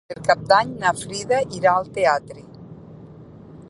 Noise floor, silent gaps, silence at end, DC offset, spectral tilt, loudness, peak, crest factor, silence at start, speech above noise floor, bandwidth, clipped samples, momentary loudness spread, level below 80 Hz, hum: -42 dBFS; none; 0 s; under 0.1%; -4 dB/octave; -20 LUFS; -2 dBFS; 20 dB; 0.1 s; 22 dB; 11.5 kHz; under 0.1%; 25 LU; -54 dBFS; none